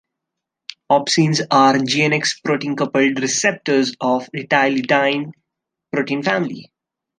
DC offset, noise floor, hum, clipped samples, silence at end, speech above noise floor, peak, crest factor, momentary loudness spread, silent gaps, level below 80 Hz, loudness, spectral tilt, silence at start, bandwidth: under 0.1%; -82 dBFS; none; under 0.1%; 0.55 s; 64 dB; -2 dBFS; 16 dB; 11 LU; none; -66 dBFS; -17 LUFS; -4 dB/octave; 0.9 s; 10 kHz